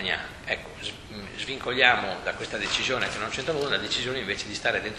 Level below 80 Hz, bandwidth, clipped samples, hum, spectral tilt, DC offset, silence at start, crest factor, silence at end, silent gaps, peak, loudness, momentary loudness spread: -52 dBFS; 13 kHz; under 0.1%; none; -2.5 dB/octave; under 0.1%; 0 s; 26 dB; 0 s; none; -2 dBFS; -27 LUFS; 14 LU